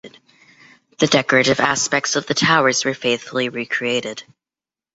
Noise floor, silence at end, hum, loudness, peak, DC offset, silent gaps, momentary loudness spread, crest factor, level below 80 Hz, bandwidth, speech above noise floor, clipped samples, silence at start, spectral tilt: under -90 dBFS; 0.75 s; none; -17 LUFS; -2 dBFS; under 0.1%; none; 8 LU; 18 dB; -60 dBFS; 8.2 kHz; over 72 dB; under 0.1%; 0.05 s; -3 dB/octave